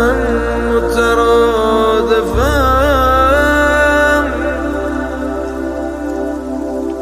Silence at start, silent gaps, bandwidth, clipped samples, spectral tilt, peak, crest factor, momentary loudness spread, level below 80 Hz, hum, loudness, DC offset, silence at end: 0 s; none; 15.5 kHz; under 0.1%; -5.5 dB/octave; 0 dBFS; 12 dB; 10 LU; -24 dBFS; none; -13 LUFS; under 0.1%; 0 s